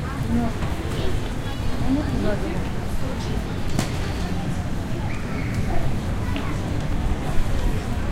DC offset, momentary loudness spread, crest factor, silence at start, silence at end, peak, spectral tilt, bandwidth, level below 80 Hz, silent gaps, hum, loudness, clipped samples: under 0.1%; 4 LU; 16 dB; 0 s; 0 s; -6 dBFS; -6.5 dB/octave; 15 kHz; -28 dBFS; none; none; -26 LUFS; under 0.1%